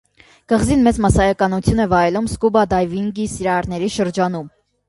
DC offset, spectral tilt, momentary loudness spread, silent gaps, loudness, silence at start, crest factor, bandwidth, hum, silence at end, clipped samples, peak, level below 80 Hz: under 0.1%; -6 dB/octave; 8 LU; none; -17 LUFS; 0.5 s; 16 dB; 11.5 kHz; none; 0.4 s; under 0.1%; -2 dBFS; -32 dBFS